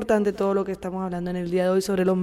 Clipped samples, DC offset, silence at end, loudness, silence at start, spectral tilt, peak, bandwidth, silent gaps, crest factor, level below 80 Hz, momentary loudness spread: under 0.1%; under 0.1%; 0 s; -25 LUFS; 0 s; -6.5 dB/octave; -10 dBFS; 15 kHz; none; 14 dB; -52 dBFS; 7 LU